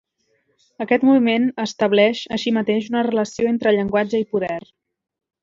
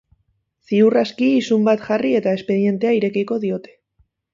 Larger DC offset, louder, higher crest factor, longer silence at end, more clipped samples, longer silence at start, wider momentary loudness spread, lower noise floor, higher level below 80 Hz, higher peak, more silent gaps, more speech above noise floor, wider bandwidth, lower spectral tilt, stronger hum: neither; about the same, -19 LUFS vs -18 LUFS; about the same, 18 dB vs 14 dB; first, 0.85 s vs 0.7 s; neither; about the same, 0.8 s vs 0.7 s; about the same, 8 LU vs 7 LU; about the same, -67 dBFS vs -67 dBFS; about the same, -60 dBFS vs -64 dBFS; about the same, -2 dBFS vs -4 dBFS; neither; about the same, 48 dB vs 50 dB; about the same, 7.6 kHz vs 7.6 kHz; second, -5.5 dB/octave vs -7 dB/octave; neither